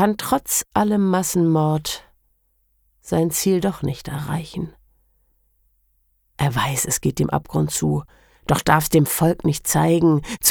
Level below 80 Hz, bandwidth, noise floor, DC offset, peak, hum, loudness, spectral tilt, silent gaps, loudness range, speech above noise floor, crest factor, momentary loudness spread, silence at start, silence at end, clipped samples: -44 dBFS; over 20 kHz; -65 dBFS; under 0.1%; -2 dBFS; none; -20 LUFS; -5 dB/octave; none; 7 LU; 45 dB; 20 dB; 10 LU; 0 s; 0 s; under 0.1%